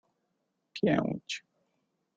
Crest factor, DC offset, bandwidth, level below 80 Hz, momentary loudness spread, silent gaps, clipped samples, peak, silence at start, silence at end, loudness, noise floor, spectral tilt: 22 dB; under 0.1%; 9 kHz; -68 dBFS; 12 LU; none; under 0.1%; -14 dBFS; 0.75 s; 0.8 s; -32 LUFS; -80 dBFS; -6 dB/octave